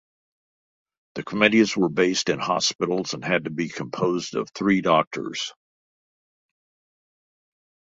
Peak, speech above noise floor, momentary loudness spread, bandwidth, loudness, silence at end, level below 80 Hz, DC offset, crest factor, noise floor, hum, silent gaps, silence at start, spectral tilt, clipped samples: -2 dBFS; over 67 dB; 11 LU; 8 kHz; -23 LUFS; 2.45 s; -64 dBFS; under 0.1%; 22 dB; under -90 dBFS; none; 2.75-2.79 s, 5.07-5.11 s; 1.15 s; -4 dB/octave; under 0.1%